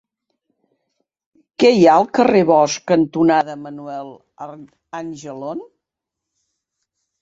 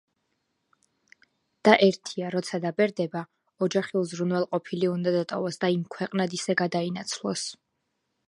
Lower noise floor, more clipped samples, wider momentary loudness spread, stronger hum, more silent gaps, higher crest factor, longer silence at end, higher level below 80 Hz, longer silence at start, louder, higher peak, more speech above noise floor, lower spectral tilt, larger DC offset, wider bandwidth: first, -83 dBFS vs -78 dBFS; neither; first, 23 LU vs 10 LU; neither; neither; second, 18 dB vs 26 dB; first, 1.55 s vs 0.75 s; first, -60 dBFS vs -76 dBFS; about the same, 1.6 s vs 1.65 s; first, -14 LUFS vs -27 LUFS; about the same, -2 dBFS vs -2 dBFS; first, 66 dB vs 52 dB; about the same, -5.5 dB/octave vs -5 dB/octave; neither; second, 7.8 kHz vs 11.5 kHz